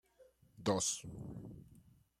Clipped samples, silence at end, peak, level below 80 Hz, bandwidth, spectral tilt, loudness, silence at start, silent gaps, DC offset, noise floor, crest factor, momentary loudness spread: under 0.1%; 0.4 s; -20 dBFS; -66 dBFS; 15.5 kHz; -3.5 dB/octave; -39 LUFS; 0.2 s; none; under 0.1%; -67 dBFS; 22 dB; 19 LU